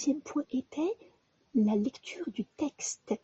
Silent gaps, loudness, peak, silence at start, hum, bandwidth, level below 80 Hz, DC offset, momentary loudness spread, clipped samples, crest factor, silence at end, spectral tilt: none; -33 LUFS; -18 dBFS; 0 s; none; 8.2 kHz; -74 dBFS; under 0.1%; 10 LU; under 0.1%; 16 dB; 0.05 s; -5 dB/octave